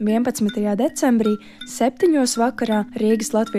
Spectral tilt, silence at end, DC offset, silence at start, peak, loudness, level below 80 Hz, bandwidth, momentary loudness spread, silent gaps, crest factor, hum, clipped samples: -5 dB/octave; 0 s; under 0.1%; 0 s; -6 dBFS; -20 LUFS; -58 dBFS; 15.5 kHz; 5 LU; none; 12 dB; none; under 0.1%